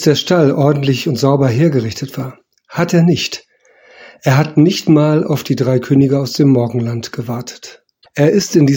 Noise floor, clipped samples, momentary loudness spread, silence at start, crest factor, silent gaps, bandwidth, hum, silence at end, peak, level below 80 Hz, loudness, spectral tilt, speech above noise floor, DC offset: -47 dBFS; under 0.1%; 13 LU; 0 s; 14 dB; none; 17 kHz; none; 0 s; 0 dBFS; -52 dBFS; -14 LUFS; -6.5 dB/octave; 35 dB; under 0.1%